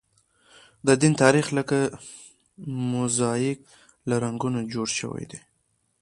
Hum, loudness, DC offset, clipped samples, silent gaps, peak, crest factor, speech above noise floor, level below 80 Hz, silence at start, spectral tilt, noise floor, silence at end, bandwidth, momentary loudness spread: none; -24 LUFS; under 0.1%; under 0.1%; none; -2 dBFS; 24 dB; 47 dB; -62 dBFS; 0.85 s; -5 dB/octave; -71 dBFS; 0.65 s; 11.5 kHz; 21 LU